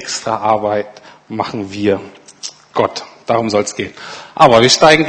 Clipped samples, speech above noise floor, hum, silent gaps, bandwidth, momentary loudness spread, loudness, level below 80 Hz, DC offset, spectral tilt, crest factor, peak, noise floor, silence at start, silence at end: 0.3%; 19 dB; none; none; 11 kHz; 21 LU; -14 LUFS; -50 dBFS; under 0.1%; -3.5 dB/octave; 14 dB; 0 dBFS; -33 dBFS; 0 s; 0 s